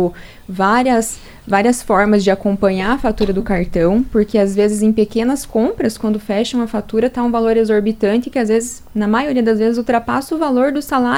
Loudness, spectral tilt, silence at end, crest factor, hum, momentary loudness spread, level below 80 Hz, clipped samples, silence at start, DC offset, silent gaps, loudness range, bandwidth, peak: -16 LUFS; -5.5 dB/octave; 0 s; 16 dB; none; 5 LU; -36 dBFS; under 0.1%; 0 s; under 0.1%; none; 1 LU; 16.5 kHz; 0 dBFS